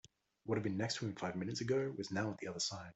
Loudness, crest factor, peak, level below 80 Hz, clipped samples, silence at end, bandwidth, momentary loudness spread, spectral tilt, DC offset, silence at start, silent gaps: -40 LUFS; 16 dB; -24 dBFS; -74 dBFS; under 0.1%; 0.05 s; 8.2 kHz; 4 LU; -4.5 dB/octave; under 0.1%; 0.45 s; none